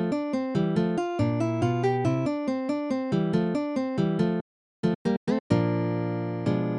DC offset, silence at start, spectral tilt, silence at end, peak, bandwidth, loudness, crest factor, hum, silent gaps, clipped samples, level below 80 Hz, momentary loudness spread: under 0.1%; 0 s; -8 dB/octave; 0 s; -10 dBFS; 10.5 kHz; -27 LUFS; 16 dB; none; 4.41-4.83 s, 4.95-5.05 s, 5.17-5.27 s, 5.40-5.50 s; under 0.1%; -58 dBFS; 4 LU